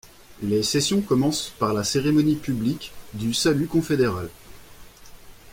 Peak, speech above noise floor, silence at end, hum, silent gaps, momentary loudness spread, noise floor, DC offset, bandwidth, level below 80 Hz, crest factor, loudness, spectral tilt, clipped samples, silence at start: -8 dBFS; 22 dB; 0 s; none; none; 12 LU; -45 dBFS; under 0.1%; 16.5 kHz; -50 dBFS; 16 dB; -23 LUFS; -5 dB/octave; under 0.1%; 0.05 s